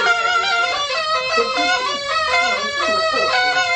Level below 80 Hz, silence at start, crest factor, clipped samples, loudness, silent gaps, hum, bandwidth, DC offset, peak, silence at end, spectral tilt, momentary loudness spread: -54 dBFS; 0 s; 14 dB; under 0.1%; -17 LUFS; none; none; 9.2 kHz; under 0.1%; -4 dBFS; 0 s; -0.5 dB/octave; 3 LU